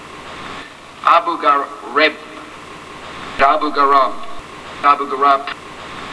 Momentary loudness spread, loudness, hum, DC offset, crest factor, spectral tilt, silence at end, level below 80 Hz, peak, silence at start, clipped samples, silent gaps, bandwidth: 20 LU; -15 LUFS; none; under 0.1%; 18 dB; -3.5 dB/octave; 0 s; -48 dBFS; 0 dBFS; 0 s; under 0.1%; none; 11 kHz